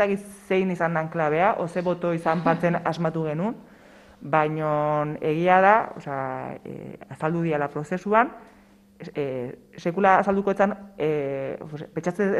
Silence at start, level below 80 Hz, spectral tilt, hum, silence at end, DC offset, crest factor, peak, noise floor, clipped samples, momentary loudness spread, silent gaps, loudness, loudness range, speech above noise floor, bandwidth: 0 s; -62 dBFS; -7.5 dB/octave; none; 0 s; under 0.1%; 22 dB; -4 dBFS; -50 dBFS; under 0.1%; 15 LU; none; -24 LUFS; 4 LU; 26 dB; 12.5 kHz